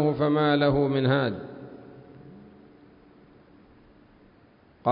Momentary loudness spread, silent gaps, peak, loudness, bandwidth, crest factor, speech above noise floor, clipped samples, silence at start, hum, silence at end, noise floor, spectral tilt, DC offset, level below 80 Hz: 26 LU; none; -10 dBFS; -24 LUFS; 5.2 kHz; 18 dB; 34 dB; under 0.1%; 0 s; none; 0 s; -57 dBFS; -11 dB/octave; under 0.1%; -56 dBFS